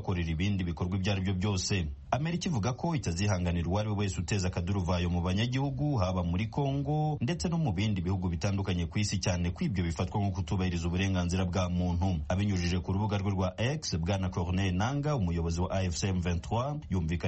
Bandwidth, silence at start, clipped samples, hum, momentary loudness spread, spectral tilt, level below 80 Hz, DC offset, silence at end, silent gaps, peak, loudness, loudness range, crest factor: 8.4 kHz; 0 s; under 0.1%; none; 2 LU; -6 dB/octave; -44 dBFS; under 0.1%; 0 s; none; -14 dBFS; -31 LUFS; 1 LU; 16 dB